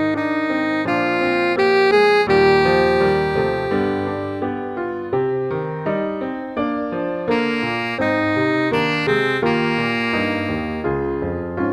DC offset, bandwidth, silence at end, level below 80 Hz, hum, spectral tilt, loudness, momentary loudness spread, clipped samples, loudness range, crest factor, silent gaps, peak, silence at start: under 0.1%; 11 kHz; 0 s; -44 dBFS; none; -6.5 dB/octave; -19 LUFS; 10 LU; under 0.1%; 7 LU; 14 dB; none; -4 dBFS; 0 s